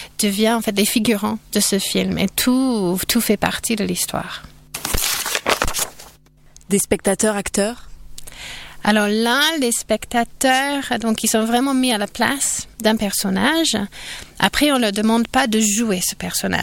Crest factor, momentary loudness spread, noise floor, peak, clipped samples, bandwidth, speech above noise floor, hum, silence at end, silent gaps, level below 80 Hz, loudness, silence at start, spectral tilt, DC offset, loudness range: 18 dB; 9 LU; -47 dBFS; -2 dBFS; under 0.1%; 17 kHz; 29 dB; none; 0 s; none; -40 dBFS; -18 LUFS; 0 s; -3 dB/octave; under 0.1%; 4 LU